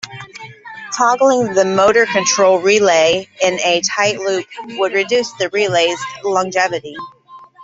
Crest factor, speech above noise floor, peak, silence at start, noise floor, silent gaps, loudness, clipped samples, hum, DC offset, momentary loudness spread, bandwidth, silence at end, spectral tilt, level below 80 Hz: 14 dB; 20 dB; -2 dBFS; 0.05 s; -35 dBFS; none; -14 LUFS; under 0.1%; none; under 0.1%; 19 LU; 8 kHz; 0 s; -2.5 dB/octave; -58 dBFS